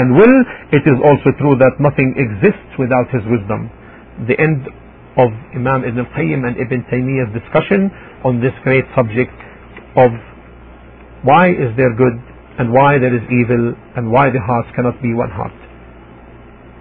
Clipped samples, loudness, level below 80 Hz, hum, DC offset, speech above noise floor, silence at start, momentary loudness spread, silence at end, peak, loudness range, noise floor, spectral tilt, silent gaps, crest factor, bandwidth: under 0.1%; -14 LUFS; -42 dBFS; none; under 0.1%; 25 dB; 0 s; 11 LU; 0.95 s; 0 dBFS; 4 LU; -38 dBFS; -12 dB/octave; none; 14 dB; 4.3 kHz